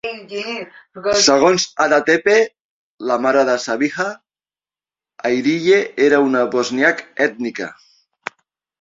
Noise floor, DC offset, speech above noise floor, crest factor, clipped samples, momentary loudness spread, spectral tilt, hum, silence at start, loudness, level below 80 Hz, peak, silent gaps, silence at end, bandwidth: under -90 dBFS; under 0.1%; over 74 dB; 18 dB; under 0.1%; 15 LU; -3 dB/octave; none; 0.05 s; -16 LUFS; -60 dBFS; 0 dBFS; 2.60-2.98 s; 1.05 s; 7.8 kHz